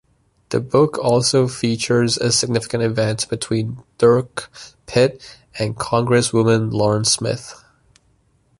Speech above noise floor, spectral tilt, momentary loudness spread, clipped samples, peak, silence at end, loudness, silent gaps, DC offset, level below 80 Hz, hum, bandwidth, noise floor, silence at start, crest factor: 42 dB; -4.5 dB/octave; 13 LU; under 0.1%; -2 dBFS; 1.05 s; -18 LUFS; none; under 0.1%; -50 dBFS; none; 11.5 kHz; -60 dBFS; 0.5 s; 16 dB